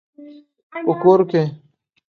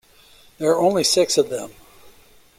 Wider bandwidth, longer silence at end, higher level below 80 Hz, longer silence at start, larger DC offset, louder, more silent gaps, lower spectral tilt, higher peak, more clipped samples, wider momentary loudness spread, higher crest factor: second, 6.6 kHz vs 16.5 kHz; second, 0.6 s vs 0.85 s; second, -68 dBFS vs -58 dBFS; second, 0.2 s vs 0.6 s; neither; about the same, -17 LUFS vs -19 LUFS; first, 0.63-0.70 s vs none; first, -9 dB/octave vs -3 dB/octave; about the same, -2 dBFS vs -4 dBFS; neither; about the same, 12 LU vs 13 LU; about the same, 18 dB vs 18 dB